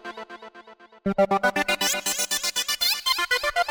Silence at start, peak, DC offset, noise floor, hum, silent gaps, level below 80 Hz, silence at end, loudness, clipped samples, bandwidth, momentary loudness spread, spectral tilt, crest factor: 0.05 s; -10 dBFS; under 0.1%; -48 dBFS; none; none; -56 dBFS; 0 s; -23 LUFS; under 0.1%; over 20 kHz; 16 LU; -1.5 dB/octave; 14 dB